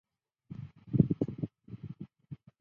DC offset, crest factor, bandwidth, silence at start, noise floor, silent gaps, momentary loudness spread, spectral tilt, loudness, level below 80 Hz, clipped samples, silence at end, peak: under 0.1%; 26 dB; 4.2 kHz; 0.5 s; -53 dBFS; none; 20 LU; -12.5 dB/octave; -32 LUFS; -58 dBFS; under 0.1%; 0.25 s; -10 dBFS